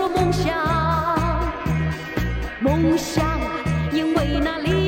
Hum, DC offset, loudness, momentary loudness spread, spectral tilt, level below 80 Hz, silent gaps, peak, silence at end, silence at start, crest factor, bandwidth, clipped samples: none; under 0.1%; -22 LUFS; 5 LU; -6 dB/octave; -30 dBFS; none; -6 dBFS; 0 s; 0 s; 14 dB; 16.5 kHz; under 0.1%